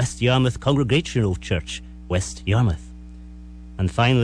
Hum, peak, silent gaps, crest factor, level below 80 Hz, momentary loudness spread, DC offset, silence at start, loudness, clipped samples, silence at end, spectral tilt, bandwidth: none; -8 dBFS; none; 14 dB; -38 dBFS; 22 LU; under 0.1%; 0 s; -22 LUFS; under 0.1%; 0 s; -6 dB/octave; 11 kHz